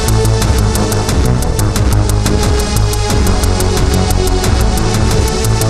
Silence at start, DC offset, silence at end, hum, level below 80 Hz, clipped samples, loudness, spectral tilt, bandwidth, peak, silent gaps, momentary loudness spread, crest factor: 0 s; under 0.1%; 0 s; none; -14 dBFS; under 0.1%; -13 LUFS; -5 dB/octave; 14 kHz; 0 dBFS; none; 1 LU; 10 dB